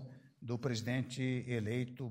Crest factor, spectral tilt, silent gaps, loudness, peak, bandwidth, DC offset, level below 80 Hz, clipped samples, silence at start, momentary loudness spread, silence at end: 16 dB; -6 dB/octave; none; -38 LUFS; -22 dBFS; 16 kHz; under 0.1%; -72 dBFS; under 0.1%; 0 s; 9 LU; 0 s